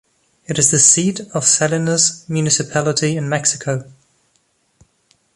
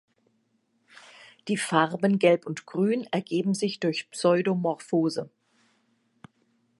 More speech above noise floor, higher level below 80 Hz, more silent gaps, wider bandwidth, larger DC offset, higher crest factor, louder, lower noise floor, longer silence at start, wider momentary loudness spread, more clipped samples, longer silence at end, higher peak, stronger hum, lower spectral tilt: about the same, 46 dB vs 46 dB; first, -56 dBFS vs -78 dBFS; neither; about the same, 11.5 kHz vs 11.5 kHz; neither; about the same, 18 dB vs 22 dB; first, -15 LUFS vs -26 LUFS; second, -63 dBFS vs -71 dBFS; second, 0.5 s vs 1.2 s; first, 12 LU vs 9 LU; neither; about the same, 1.45 s vs 1.5 s; first, 0 dBFS vs -6 dBFS; neither; second, -3 dB/octave vs -5.5 dB/octave